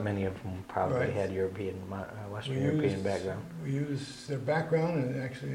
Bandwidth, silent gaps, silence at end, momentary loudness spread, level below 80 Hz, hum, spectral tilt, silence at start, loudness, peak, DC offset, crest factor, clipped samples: 15.5 kHz; none; 0 s; 10 LU; -62 dBFS; none; -7 dB/octave; 0 s; -33 LUFS; -16 dBFS; under 0.1%; 16 dB; under 0.1%